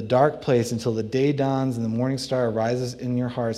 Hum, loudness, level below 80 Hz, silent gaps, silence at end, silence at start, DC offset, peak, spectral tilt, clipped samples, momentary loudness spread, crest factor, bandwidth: none; -24 LUFS; -58 dBFS; none; 0 s; 0 s; under 0.1%; -6 dBFS; -6.5 dB/octave; under 0.1%; 6 LU; 18 dB; 13.5 kHz